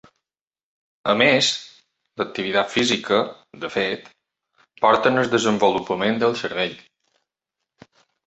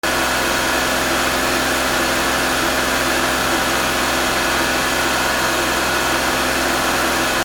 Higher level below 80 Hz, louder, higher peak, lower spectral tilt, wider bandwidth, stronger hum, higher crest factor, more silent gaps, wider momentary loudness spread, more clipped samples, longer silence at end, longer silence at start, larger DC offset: second, -62 dBFS vs -36 dBFS; second, -20 LUFS vs -17 LUFS; about the same, -2 dBFS vs -4 dBFS; first, -3.5 dB/octave vs -2 dB/octave; second, 8.2 kHz vs over 20 kHz; neither; first, 20 dB vs 14 dB; neither; first, 13 LU vs 0 LU; neither; first, 1.45 s vs 0 s; first, 1.05 s vs 0.05 s; neither